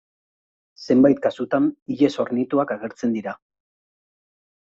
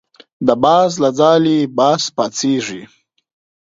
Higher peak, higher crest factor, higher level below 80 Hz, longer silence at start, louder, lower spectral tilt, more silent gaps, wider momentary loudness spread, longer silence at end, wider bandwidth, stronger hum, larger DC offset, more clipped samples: second, -4 dBFS vs 0 dBFS; about the same, 20 dB vs 16 dB; second, -66 dBFS vs -56 dBFS; first, 0.8 s vs 0.4 s; second, -21 LUFS vs -14 LUFS; first, -7 dB/octave vs -5 dB/octave; first, 1.82-1.86 s vs none; first, 13 LU vs 8 LU; first, 1.35 s vs 0.75 s; about the same, 7.6 kHz vs 7.8 kHz; neither; neither; neither